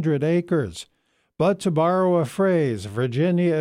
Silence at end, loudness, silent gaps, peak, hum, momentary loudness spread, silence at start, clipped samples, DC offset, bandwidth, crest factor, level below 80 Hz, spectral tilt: 0 s; -22 LUFS; none; -10 dBFS; none; 6 LU; 0 s; under 0.1%; under 0.1%; 13 kHz; 12 dB; -58 dBFS; -7.5 dB/octave